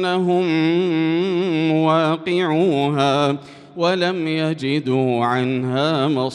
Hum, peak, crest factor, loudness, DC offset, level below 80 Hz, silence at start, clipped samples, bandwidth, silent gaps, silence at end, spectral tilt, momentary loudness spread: none; -4 dBFS; 14 dB; -19 LUFS; under 0.1%; -66 dBFS; 0 s; under 0.1%; 10.5 kHz; none; 0 s; -7 dB/octave; 4 LU